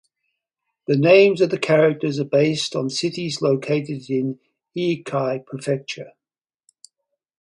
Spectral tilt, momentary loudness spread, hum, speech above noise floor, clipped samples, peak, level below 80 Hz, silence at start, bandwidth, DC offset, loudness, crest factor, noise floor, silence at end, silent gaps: -5.5 dB/octave; 14 LU; none; over 70 dB; under 0.1%; 0 dBFS; -68 dBFS; 0.9 s; 11 kHz; under 0.1%; -20 LUFS; 20 dB; under -90 dBFS; 1.3 s; none